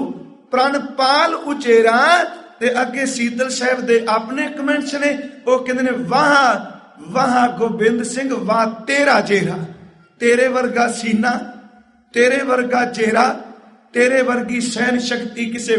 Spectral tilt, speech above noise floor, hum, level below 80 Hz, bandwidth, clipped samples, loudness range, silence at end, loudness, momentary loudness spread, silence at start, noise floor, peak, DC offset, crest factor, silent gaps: -4 dB/octave; 31 dB; none; -62 dBFS; 11.5 kHz; under 0.1%; 2 LU; 0 s; -17 LUFS; 10 LU; 0 s; -47 dBFS; 0 dBFS; under 0.1%; 16 dB; none